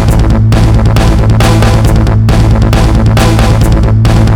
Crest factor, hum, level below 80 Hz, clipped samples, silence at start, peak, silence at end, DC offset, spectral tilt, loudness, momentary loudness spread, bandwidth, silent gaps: 6 dB; none; -10 dBFS; 0.7%; 0 s; 0 dBFS; 0 s; under 0.1%; -6.5 dB/octave; -7 LUFS; 1 LU; 15 kHz; none